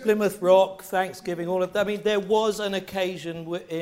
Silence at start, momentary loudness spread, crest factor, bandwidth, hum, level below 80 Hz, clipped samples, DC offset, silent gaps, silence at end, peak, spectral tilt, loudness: 0 s; 12 LU; 18 dB; 16 kHz; none; -62 dBFS; under 0.1%; under 0.1%; none; 0 s; -6 dBFS; -5 dB/octave; -25 LUFS